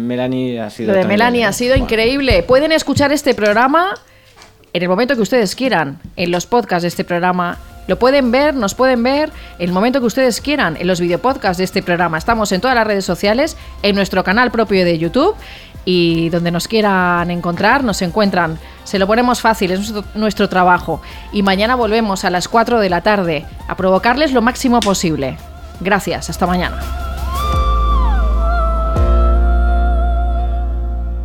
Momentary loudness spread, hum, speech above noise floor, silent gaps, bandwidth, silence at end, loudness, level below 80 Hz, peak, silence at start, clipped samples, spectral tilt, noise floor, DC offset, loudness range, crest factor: 9 LU; none; 29 dB; none; 16.5 kHz; 0 s; -15 LUFS; -22 dBFS; 0 dBFS; 0 s; under 0.1%; -5 dB/octave; -43 dBFS; 0.2%; 3 LU; 14 dB